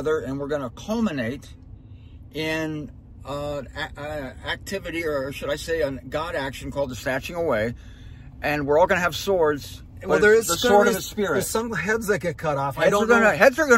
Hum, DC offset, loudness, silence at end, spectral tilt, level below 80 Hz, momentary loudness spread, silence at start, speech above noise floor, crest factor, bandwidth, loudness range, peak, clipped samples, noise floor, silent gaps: none; under 0.1%; -23 LUFS; 0 s; -4.5 dB/octave; -44 dBFS; 15 LU; 0 s; 20 dB; 20 dB; 16 kHz; 10 LU; -2 dBFS; under 0.1%; -43 dBFS; none